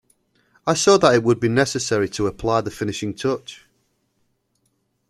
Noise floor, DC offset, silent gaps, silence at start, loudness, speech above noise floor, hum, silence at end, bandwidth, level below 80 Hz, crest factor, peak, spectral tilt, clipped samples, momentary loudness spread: -69 dBFS; under 0.1%; none; 0.65 s; -20 LUFS; 50 dB; none; 1.55 s; 13 kHz; -50 dBFS; 20 dB; -2 dBFS; -4.5 dB/octave; under 0.1%; 12 LU